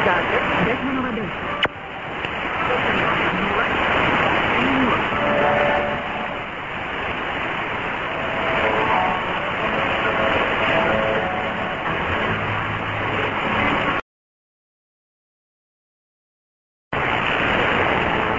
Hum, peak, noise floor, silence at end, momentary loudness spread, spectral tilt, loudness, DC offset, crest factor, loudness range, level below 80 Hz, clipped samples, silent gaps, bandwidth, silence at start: none; -4 dBFS; under -90 dBFS; 0 s; 7 LU; -6 dB/octave; -20 LUFS; under 0.1%; 18 dB; 6 LU; -42 dBFS; under 0.1%; 14.02-16.91 s; 7.6 kHz; 0 s